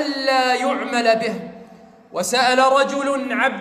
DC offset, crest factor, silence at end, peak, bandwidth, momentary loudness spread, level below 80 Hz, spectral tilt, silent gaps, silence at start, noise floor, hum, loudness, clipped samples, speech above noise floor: under 0.1%; 16 dB; 0 s; -4 dBFS; 15.5 kHz; 12 LU; -66 dBFS; -2.5 dB/octave; none; 0 s; -45 dBFS; none; -18 LUFS; under 0.1%; 27 dB